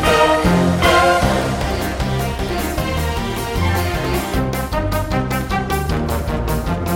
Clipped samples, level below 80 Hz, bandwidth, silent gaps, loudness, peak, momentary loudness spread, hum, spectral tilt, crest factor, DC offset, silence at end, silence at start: under 0.1%; -26 dBFS; 17 kHz; none; -18 LUFS; 0 dBFS; 8 LU; none; -5.5 dB/octave; 16 dB; under 0.1%; 0 s; 0 s